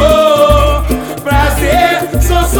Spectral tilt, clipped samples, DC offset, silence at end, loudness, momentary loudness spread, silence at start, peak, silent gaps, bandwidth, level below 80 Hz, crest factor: -5 dB/octave; 0.2%; under 0.1%; 0 s; -10 LUFS; 7 LU; 0 s; 0 dBFS; none; over 20 kHz; -16 dBFS; 10 dB